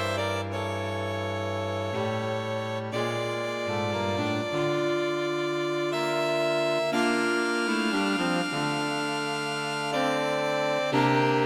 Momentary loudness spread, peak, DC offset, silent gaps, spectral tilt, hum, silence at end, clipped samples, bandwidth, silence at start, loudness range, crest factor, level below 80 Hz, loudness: 6 LU; -10 dBFS; under 0.1%; none; -5 dB/octave; none; 0 s; under 0.1%; 16 kHz; 0 s; 4 LU; 16 dB; -66 dBFS; -27 LUFS